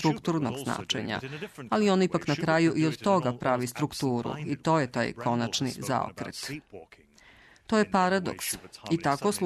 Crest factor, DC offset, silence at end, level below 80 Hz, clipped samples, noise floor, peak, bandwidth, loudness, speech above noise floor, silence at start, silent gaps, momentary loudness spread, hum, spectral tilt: 16 dB; under 0.1%; 0 s; -62 dBFS; under 0.1%; -56 dBFS; -12 dBFS; 13.5 kHz; -28 LUFS; 28 dB; 0 s; none; 11 LU; none; -5 dB/octave